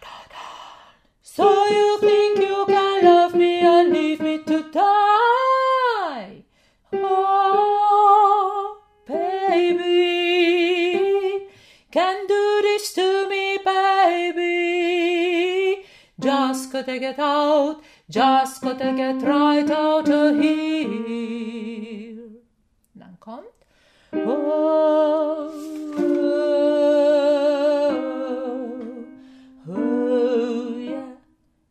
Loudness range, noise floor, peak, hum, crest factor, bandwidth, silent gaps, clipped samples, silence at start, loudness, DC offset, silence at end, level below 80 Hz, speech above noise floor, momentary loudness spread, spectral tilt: 7 LU; -65 dBFS; -2 dBFS; none; 18 dB; 14 kHz; none; under 0.1%; 0 s; -19 LUFS; under 0.1%; 0.55 s; -66 dBFS; 45 dB; 15 LU; -4 dB/octave